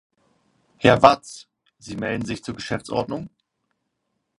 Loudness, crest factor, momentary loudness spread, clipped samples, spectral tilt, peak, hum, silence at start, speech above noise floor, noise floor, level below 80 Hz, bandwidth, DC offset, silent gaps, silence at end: -21 LUFS; 24 dB; 23 LU; under 0.1%; -5.5 dB/octave; 0 dBFS; none; 0.8 s; 55 dB; -76 dBFS; -52 dBFS; 11.5 kHz; under 0.1%; none; 1.1 s